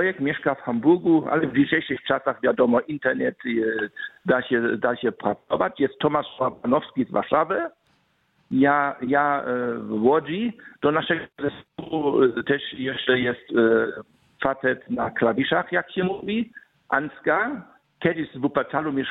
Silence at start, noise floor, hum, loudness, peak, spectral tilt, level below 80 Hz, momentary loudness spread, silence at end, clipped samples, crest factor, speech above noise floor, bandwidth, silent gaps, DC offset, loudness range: 0 s; -66 dBFS; none; -23 LUFS; -4 dBFS; -9 dB/octave; -62 dBFS; 8 LU; 0 s; under 0.1%; 20 dB; 43 dB; 4.1 kHz; none; under 0.1%; 3 LU